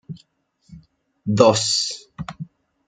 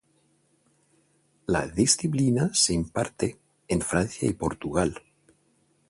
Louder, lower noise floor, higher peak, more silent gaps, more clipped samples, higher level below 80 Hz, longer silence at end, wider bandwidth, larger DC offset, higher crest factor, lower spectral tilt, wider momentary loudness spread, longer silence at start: first, -18 LUFS vs -25 LUFS; second, -61 dBFS vs -67 dBFS; first, 0 dBFS vs -6 dBFS; neither; neither; second, -56 dBFS vs -48 dBFS; second, 0.45 s vs 0.9 s; second, 9.6 kHz vs 11.5 kHz; neither; about the same, 22 dB vs 22 dB; about the same, -4 dB/octave vs -4 dB/octave; first, 24 LU vs 9 LU; second, 0.1 s vs 1.5 s